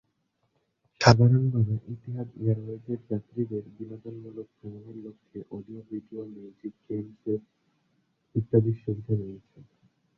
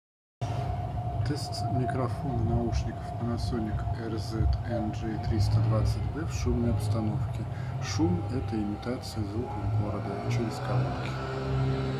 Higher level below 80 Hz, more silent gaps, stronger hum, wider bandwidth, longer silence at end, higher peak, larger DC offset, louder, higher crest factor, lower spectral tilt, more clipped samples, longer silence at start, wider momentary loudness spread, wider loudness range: second, -58 dBFS vs -38 dBFS; neither; neither; second, 7.4 kHz vs 13 kHz; first, 0.55 s vs 0 s; first, -2 dBFS vs -14 dBFS; neither; first, -27 LUFS vs -31 LUFS; first, 28 dB vs 14 dB; about the same, -7 dB/octave vs -7 dB/octave; neither; first, 1 s vs 0.4 s; first, 21 LU vs 6 LU; first, 14 LU vs 2 LU